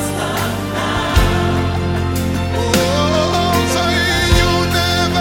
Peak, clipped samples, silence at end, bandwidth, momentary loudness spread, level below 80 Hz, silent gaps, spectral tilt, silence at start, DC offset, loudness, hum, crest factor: 0 dBFS; under 0.1%; 0 s; 17 kHz; 6 LU; -24 dBFS; none; -4.5 dB/octave; 0 s; under 0.1%; -16 LUFS; none; 14 dB